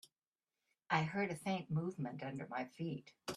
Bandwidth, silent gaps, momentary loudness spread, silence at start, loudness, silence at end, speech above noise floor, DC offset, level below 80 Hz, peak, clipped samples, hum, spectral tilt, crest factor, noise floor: 13 kHz; none; 8 LU; 0.9 s; -41 LUFS; 0 s; over 49 dB; under 0.1%; -80 dBFS; -22 dBFS; under 0.1%; none; -6 dB/octave; 22 dB; under -90 dBFS